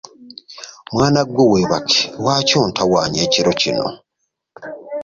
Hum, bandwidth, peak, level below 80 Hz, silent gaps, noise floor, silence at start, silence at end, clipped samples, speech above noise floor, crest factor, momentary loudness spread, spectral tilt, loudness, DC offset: none; 7.8 kHz; -2 dBFS; -48 dBFS; none; -74 dBFS; 0.2 s; 0 s; under 0.1%; 58 dB; 16 dB; 20 LU; -4 dB/octave; -16 LUFS; under 0.1%